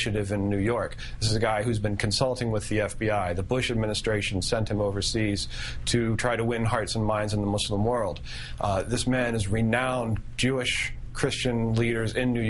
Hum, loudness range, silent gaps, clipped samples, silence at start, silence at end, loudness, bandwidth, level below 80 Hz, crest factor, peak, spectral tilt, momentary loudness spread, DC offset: none; 1 LU; none; under 0.1%; 0 s; 0 s; -27 LUFS; 11.5 kHz; -40 dBFS; 18 dB; -8 dBFS; -5 dB/octave; 5 LU; under 0.1%